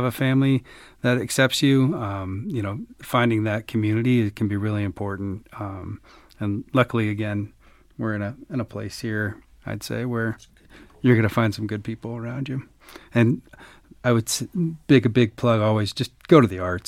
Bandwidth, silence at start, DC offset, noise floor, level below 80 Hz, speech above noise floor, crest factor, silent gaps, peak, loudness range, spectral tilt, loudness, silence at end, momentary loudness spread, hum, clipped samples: 16.5 kHz; 0 s; under 0.1%; -49 dBFS; -54 dBFS; 27 dB; 20 dB; none; -2 dBFS; 6 LU; -6 dB/octave; -23 LUFS; 0.05 s; 13 LU; none; under 0.1%